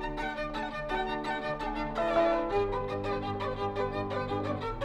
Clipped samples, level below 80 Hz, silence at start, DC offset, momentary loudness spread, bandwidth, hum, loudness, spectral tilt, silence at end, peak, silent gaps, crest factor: under 0.1%; -46 dBFS; 0 s; under 0.1%; 7 LU; 12 kHz; none; -32 LUFS; -6.5 dB/octave; 0 s; -16 dBFS; none; 16 dB